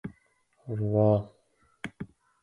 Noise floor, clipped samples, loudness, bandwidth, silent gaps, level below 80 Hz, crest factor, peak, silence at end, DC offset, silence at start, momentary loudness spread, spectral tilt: -68 dBFS; under 0.1%; -27 LUFS; 10.5 kHz; none; -58 dBFS; 20 dB; -10 dBFS; 0.4 s; under 0.1%; 0.05 s; 22 LU; -9.5 dB/octave